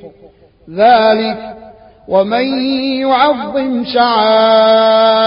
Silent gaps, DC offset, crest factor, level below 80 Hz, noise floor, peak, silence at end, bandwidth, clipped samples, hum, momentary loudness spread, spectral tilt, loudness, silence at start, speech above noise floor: none; under 0.1%; 12 dB; -52 dBFS; -38 dBFS; 0 dBFS; 0 s; 5.4 kHz; under 0.1%; none; 8 LU; -9 dB/octave; -11 LUFS; 0.05 s; 27 dB